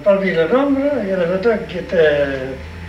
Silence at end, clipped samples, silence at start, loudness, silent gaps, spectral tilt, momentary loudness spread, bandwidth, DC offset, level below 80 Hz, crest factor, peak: 0 s; under 0.1%; 0 s; -17 LUFS; none; -7.5 dB/octave; 7 LU; 10.5 kHz; under 0.1%; -40 dBFS; 12 dB; -4 dBFS